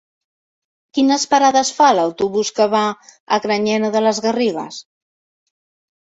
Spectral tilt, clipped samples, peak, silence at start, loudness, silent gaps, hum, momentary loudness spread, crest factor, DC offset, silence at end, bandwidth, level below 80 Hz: -3.5 dB/octave; under 0.1%; -2 dBFS; 0.95 s; -16 LUFS; 3.20-3.27 s; none; 11 LU; 16 dB; under 0.1%; 1.3 s; 8.4 kHz; -64 dBFS